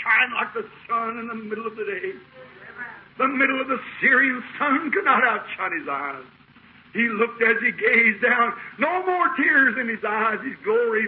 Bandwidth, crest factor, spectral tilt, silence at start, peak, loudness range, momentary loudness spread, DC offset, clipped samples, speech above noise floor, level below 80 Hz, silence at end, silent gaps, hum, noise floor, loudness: 5.2 kHz; 16 dB; -9 dB/octave; 0 s; -6 dBFS; 7 LU; 15 LU; under 0.1%; under 0.1%; 29 dB; -68 dBFS; 0 s; none; none; -51 dBFS; -21 LUFS